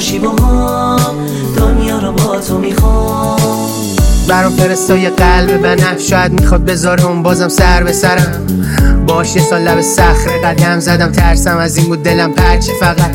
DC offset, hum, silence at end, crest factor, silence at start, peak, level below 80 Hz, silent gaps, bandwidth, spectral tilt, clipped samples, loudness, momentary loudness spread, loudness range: under 0.1%; none; 0 s; 10 dB; 0 s; 0 dBFS; -16 dBFS; none; 17.5 kHz; -5 dB/octave; 0.3%; -10 LUFS; 4 LU; 2 LU